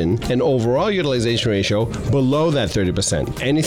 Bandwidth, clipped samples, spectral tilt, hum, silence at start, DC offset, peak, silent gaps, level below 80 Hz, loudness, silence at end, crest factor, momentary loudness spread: 16 kHz; under 0.1%; -5.5 dB/octave; none; 0 s; under 0.1%; -10 dBFS; none; -38 dBFS; -19 LUFS; 0 s; 8 dB; 3 LU